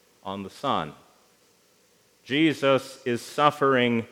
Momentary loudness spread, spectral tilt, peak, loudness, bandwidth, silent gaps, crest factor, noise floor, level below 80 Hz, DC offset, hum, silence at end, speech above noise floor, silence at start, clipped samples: 15 LU; -5.5 dB/octave; -4 dBFS; -24 LUFS; 16 kHz; none; 24 dB; -62 dBFS; -72 dBFS; under 0.1%; none; 0.05 s; 38 dB; 0.25 s; under 0.1%